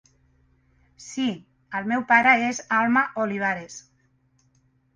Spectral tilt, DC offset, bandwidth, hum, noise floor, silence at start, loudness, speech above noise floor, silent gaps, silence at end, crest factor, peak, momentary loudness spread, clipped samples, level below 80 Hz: -4 dB/octave; under 0.1%; 9.8 kHz; none; -65 dBFS; 1 s; -22 LUFS; 42 dB; none; 1.15 s; 22 dB; -4 dBFS; 19 LU; under 0.1%; -66 dBFS